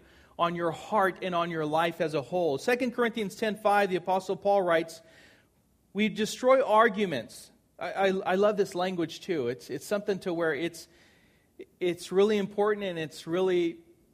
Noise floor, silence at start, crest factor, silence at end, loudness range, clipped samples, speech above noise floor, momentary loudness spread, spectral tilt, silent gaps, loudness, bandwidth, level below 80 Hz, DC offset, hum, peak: -67 dBFS; 0.4 s; 20 dB; 0.35 s; 4 LU; under 0.1%; 39 dB; 9 LU; -5 dB/octave; none; -28 LUFS; 15.5 kHz; -70 dBFS; under 0.1%; none; -10 dBFS